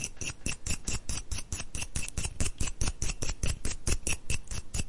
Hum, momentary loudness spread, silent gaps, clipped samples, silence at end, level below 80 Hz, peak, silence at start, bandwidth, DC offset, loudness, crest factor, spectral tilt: none; 4 LU; none; under 0.1%; 0 s; -36 dBFS; -12 dBFS; 0 s; 11.5 kHz; under 0.1%; -35 LUFS; 18 dB; -2.5 dB/octave